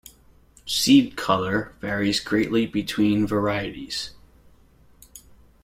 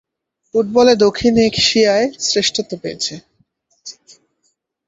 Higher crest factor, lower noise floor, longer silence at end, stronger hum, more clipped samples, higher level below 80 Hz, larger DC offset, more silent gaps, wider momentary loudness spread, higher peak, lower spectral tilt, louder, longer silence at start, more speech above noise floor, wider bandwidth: about the same, 20 dB vs 16 dB; second, -54 dBFS vs -68 dBFS; second, 0.45 s vs 0.95 s; neither; neither; about the same, -52 dBFS vs -48 dBFS; neither; neither; second, 13 LU vs 23 LU; second, -6 dBFS vs 0 dBFS; about the same, -4.5 dB/octave vs -3.5 dB/octave; second, -23 LUFS vs -15 LUFS; about the same, 0.65 s vs 0.55 s; second, 32 dB vs 53 dB; first, 16 kHz vs 8 kHz